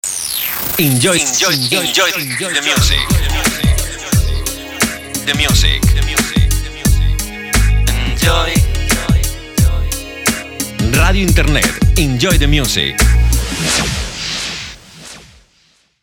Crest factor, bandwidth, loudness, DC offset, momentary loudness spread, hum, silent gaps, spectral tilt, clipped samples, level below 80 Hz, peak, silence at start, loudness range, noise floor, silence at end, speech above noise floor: 14 dB; 18.5 kHz; -14 LUFS; under 0.1%; 8 LU; none; none; -3.5 dB/octave; under 0.1%; -18 dBFS; 0 dBFS; 0.05 s; 3 LU; -55 dBFS; 0.85 s; 42 dB